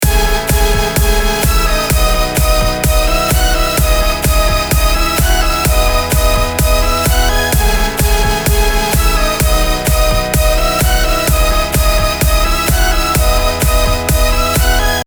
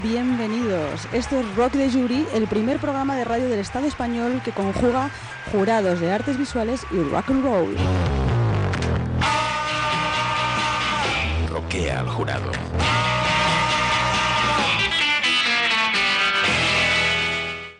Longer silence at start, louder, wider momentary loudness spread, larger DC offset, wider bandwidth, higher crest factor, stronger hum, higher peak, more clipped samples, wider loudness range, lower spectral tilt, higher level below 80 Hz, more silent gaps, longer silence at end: about the same, 0 s vs 0 s; first, -13 LUFS vs -21 LUFS; second, 1 LU vs 7 LU; neither; first, over 20 kHz vs 10.5 kHz; about the same, 10 dB vs 14 dB; neither; first, 0 dBFS vs -8 dBFS; neither; second, 0 LU vs 5 LU; about the same, -3.5 dB/octave vs -4.5 dB/octave; first, -14 dBFS vs -36 dBFS; neither; about the same, 0.05 s vs 0.05 s